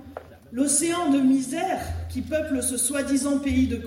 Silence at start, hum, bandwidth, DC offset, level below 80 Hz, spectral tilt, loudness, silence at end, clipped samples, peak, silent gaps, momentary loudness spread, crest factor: 0 s; none; 16.5 kHz; under 0.1%; -46 dBFS; -4 dB/octave; -24 LUFS; 0 s; under 0.1%; -8 dBFS; none; 11 LU; 16 dB